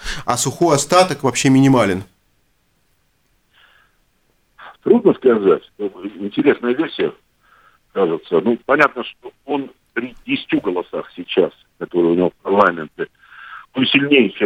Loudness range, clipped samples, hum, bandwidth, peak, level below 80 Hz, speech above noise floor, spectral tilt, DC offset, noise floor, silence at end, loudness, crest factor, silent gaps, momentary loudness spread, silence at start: 4 LU; under 0.1%; none; 16 kHz; 0 dBFS; -48 dBFS; 46 dB; -4.5 dB/octave; under 0.1%; -63 dBFS; 0 s; -17 LUFS; 18 dB; none; 15 LU; 0 s